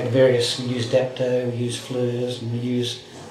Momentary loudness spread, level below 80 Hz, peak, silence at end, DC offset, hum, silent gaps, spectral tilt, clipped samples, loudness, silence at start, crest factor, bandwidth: 9 LU; -64 dBFS; -6 dBFS; 0 s; under 0.1%; none; none; -5.5 dB/octave; under 0.1%; -23 LUFS; 0 s; 16 dB; 13.5 kHz